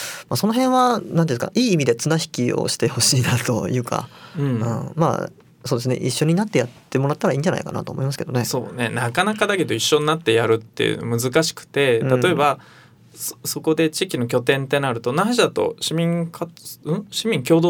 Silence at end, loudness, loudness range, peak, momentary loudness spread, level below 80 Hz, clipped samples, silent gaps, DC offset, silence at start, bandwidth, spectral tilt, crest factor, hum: 0 s; -20 LUFS; 3 LU; -2 dBFS; 9 LU; -60 dBFS; under 0.1%; none; under 0.1%; 0 s; over 20 kHz; -4.5 dB/octave; 18 dB; none